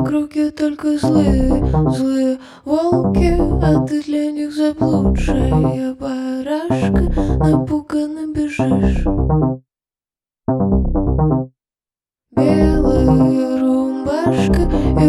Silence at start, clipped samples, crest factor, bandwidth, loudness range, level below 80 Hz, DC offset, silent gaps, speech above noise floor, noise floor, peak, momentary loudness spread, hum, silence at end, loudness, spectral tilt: 0 s; under 0.1%; 14 dB; 12 kHz; 3 LU; -24 dBFS; under 0.1%; none; over 75 dB; under -90 dBFS; -2 dBFS; 7 LU; none; 0 s; -17 LUFS; -8.5 dB/octave